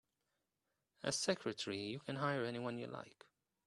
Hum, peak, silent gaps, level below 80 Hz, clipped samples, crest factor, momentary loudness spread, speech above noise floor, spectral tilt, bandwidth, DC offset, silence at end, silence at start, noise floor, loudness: none; -20 dBFS; none; -80 dBFS; under 0.1%; 24 dB; 11 LU; 47 dB; -4 dB/octave; 12 kHz; under 0.1%; 0.55 s; 1.05 s; -89 dBFS; -41 LUFS